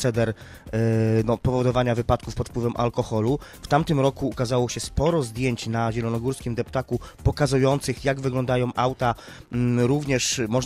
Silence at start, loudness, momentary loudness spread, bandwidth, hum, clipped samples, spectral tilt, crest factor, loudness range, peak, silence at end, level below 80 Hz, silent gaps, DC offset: 0 s; -24 LUFS; 6 LU; 15 kHz; none; under 0.1%; -6 dB/octave; 16 dB; 1 LU; -6 dBFS; 0 s; -40 dBFS; none; under 0.1%